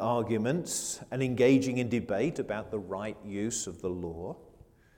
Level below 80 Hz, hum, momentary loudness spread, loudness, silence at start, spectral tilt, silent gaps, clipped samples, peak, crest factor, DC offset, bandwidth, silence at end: -60 dBFS; none; 13 LU; -31 LUFS; 0 s; -5 dB/octave; none; under 0.1%; -12 dBFS; 18 dB; under 0.1%; 18.5 kHz; 0.55 s